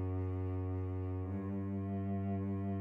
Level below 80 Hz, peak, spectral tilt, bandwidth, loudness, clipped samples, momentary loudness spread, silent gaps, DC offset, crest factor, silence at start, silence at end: -60 dBFS; -28 dBFS; -12 dB/octave; 3.2 kHz; -39 LUFS; under 0.1%; 2 LU; none; under 0.1%; 8 dB; 0 s; 0 s